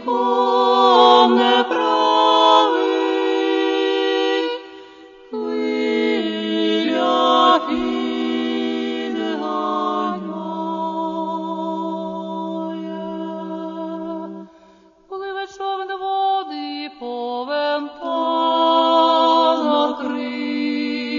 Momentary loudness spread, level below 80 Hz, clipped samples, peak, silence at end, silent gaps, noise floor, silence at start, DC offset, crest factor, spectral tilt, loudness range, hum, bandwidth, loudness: 15 LU; -62 dBFS; under 0.1%; -2 dBFS; 0 s; none; -50 dBFS; 0 s; under 0.1%; 16 dB; -4.5 dB/octave; 12 LU; none; 7.4 kHz; -19 LUFS